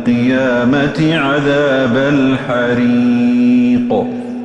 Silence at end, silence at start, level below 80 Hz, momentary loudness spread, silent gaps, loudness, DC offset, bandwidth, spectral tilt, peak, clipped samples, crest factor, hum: 0 s; 0 s; -46 dBFS; 4 LU; none; -13 LUFS; under 0.1%; 8.2 kHz; -7 dB/octave; -2 dBFS; under 0.1%; 10 dB; none